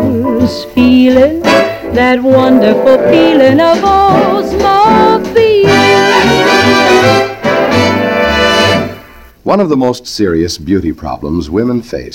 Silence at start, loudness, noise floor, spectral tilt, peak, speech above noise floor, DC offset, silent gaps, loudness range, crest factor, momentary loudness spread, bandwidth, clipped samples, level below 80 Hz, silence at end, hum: 0 s; -8 LUFS; -34 dBFS; -5 dB/octave; 0 dBFS; 26 dB; under 0.1%; none; 5 LU; 8 dB; 8 LU; 17 kHz; 2%; -32 dBFS; 0 s; none